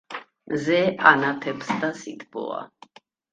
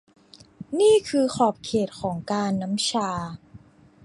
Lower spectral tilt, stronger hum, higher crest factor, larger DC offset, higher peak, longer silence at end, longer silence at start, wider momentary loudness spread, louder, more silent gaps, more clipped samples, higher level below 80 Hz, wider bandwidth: about the same, -5 dB/octave vs -5 dB/octave; neither; first, 24 dB vs 18 dB; neither; first, 0 dBFS vs -6 dBFS; first, 0.65 s vs 0.45 s; second, 0.1 s vs 0.6 s; first, 19 LU vs 14 LU; about the same, -22 LUFS vs -24 LUFS; neither; neither; second, -66 dBFS vs -58 dBFS; second, 9.4 kHz vs 11.5 kHz